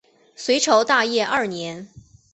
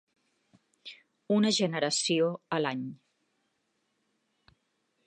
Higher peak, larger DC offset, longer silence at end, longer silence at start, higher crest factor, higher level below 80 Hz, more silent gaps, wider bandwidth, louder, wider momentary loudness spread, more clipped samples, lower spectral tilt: first, -2 dBFS vs -14 dBFS; neither; second, 0.35 s vs 2.1 s; second, 0.4 s vs 0.85 s; about the same, 20 dB vs 20 dB; first, -62 dBFS vs -82 dBFS; neither; second, 8.4 kHz vs 11 kHz; first, -20 LUFS vs -28 LUFS; second, 15 LU vs 22 LU; neither; second, -2.5 dB/octave vs -4 dB/octave